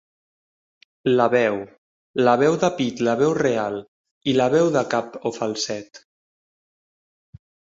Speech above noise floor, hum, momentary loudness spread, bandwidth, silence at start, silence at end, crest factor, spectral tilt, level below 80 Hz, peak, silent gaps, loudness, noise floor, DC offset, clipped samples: over 70 dB; none; 12 LU; 7.8 kHz; 1.05 s; 1.75 s; 20 dB; -5 dB/octave; -62 dBFS; -2 dBFS; 1.78-2.14 s, 3.88-4.05 s, 4.11-4.21 s; -21 LUFS; under -90 dBFS; under 0.1%; under 0.1%